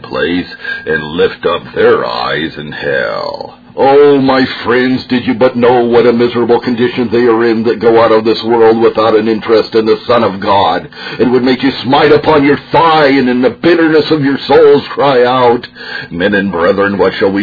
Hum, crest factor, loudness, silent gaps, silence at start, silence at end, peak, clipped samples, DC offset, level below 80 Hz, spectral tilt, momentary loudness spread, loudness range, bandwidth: none; 10 dB; -10 LUFS; none; 0 s; 0 s; 0 dBFS; 0.4%; under 0.1%; -44 dBFS; -7.5 dB/octave; 8 LU; 3 LU; 5.4 kHz